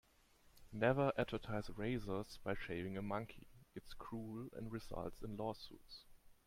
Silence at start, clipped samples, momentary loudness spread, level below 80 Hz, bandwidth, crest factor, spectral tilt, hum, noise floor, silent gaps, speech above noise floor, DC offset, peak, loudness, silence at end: 0.45 s; under 0.1%; 19 LU; -60 dBFS; 16.5 kHz; 22 dB; -7 dB/octave; none; -70 dBFS; none; 27 dB; under 0.1%; -22 dBFS; -43 LUFS; 0.15 s